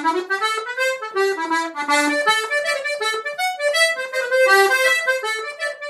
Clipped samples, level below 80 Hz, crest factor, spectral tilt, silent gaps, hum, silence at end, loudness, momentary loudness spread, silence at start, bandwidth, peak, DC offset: under 0.1%; -82 dBFS; 18 dB; 0 dB/octave; none; none; 0 s; -19 LUFS; 8 LU; 0 s; 16 kHz; -2 dBFS; under 0.1%